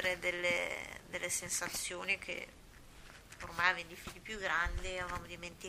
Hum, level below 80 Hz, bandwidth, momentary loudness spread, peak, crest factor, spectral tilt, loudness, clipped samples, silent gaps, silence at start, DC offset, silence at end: none; -52 dBFS; 15.5 kHz; 17 LU; -14 dBFS; 26 dB; -2 dB/octave; -37 LUFS; under 0.1%; none; 0 s; under 0.1%; 0 s